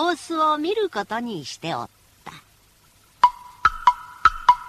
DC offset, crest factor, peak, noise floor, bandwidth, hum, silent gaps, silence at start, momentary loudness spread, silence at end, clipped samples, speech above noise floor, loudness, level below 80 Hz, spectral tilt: under 0.1%; 22 dB; -2 dBFS; -56 dBFS; 14 kHz; none; none; 0 s; 17 LU; 0 s; under 0.1%; 31 dB; -22 LUFS; -48 dBFS; -4 dB/octave